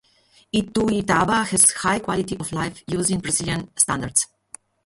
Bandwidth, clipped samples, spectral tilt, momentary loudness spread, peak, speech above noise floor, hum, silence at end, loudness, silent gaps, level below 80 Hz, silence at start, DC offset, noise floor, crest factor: 12 kHz; under 0.1%; -3 dB/octave; 12 LU; 0 dBFS; 36 dB; none; 0.6 s; -20 LUFS; none; -48 dBFS; 0.55 s; under 0.1%; -58 dBFS; 22 dB